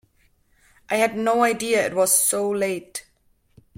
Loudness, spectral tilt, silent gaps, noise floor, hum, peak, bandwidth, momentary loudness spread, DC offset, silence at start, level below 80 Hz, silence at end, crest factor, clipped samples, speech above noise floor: -20 LUFS; -2.5 dB/octave; none; -63 dBFS; none; -4 dBFS; 16.5 kHz; 13 LU; under 0.1%; 0.9 s; -64 dBFS; 0.75 s; 18 dB; under 0.1%; 42 dB